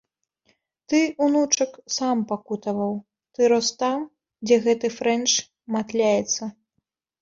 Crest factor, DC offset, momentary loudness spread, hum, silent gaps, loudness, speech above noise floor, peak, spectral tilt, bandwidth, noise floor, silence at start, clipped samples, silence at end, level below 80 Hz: 18 dB; under 0.1%; 10 LU; none; none; -23 LUFS; 55 dB; -6 dBFS; -3 dB/octave; 7.8 kHz; -77 dBFS; 0.9 s; under 0.1%; 0.7 s; -68 dBFS